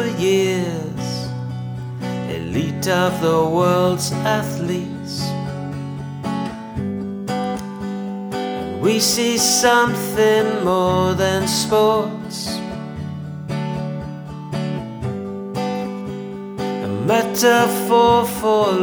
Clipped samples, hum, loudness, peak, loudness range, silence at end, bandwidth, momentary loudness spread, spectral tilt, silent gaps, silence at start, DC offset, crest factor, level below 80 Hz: under 0.1%; none; -20 LUFS; -2 dBFS; 10 LU; 0 s; over 20 kHz; 13 LU; -4.5 dB/octave; none; 0 s; under 0.1%; 16 dB; -48 dBFS